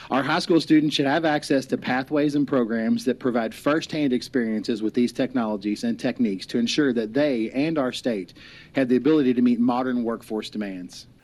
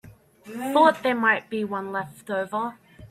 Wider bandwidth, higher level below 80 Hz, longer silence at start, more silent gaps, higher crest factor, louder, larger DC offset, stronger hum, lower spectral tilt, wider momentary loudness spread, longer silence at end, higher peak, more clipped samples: second, 13 kHz vs 15.5 kHz; about the same, -60 dBFS vs -64 dBFS; about the same, 0 s vs 0.05 s; neither; second, 14 dB vs 20 dB; about the same, -23 LUFS vs -24 LUFS; neither; neither; about the same, -5.5 dB/octave vs -5 dB/octave; second, 9 LU vs 14 LU; first, 0.2 s vs 0.05 s; about the same, -8 dBFS vs -6 dBFS; neither